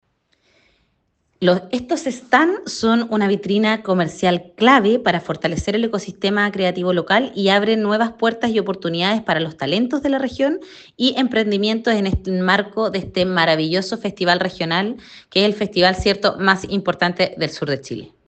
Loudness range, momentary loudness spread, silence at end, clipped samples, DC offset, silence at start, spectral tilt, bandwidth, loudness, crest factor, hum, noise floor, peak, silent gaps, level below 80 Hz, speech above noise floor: 2 LU; 6 LU; 0.2 s; under 0.1%; under 0.1%; 1.4 s; -5.5 dB/octave; 8.8 kHz; -18 LUFS; 18 dB; none; -67 dBFS; 0 dBFS; none; -44 dBFS; 48 dB